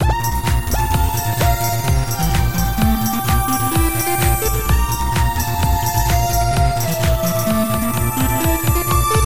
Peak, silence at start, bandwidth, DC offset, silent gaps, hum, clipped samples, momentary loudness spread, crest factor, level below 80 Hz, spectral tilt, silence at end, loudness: -2 dBFS; 0 s; 17 kHz; 3%; none; none; under 0.1%; 2 LU; 14 dB; -22 dBFS; -5 dB/octave; 0.1 s; -17 LUFS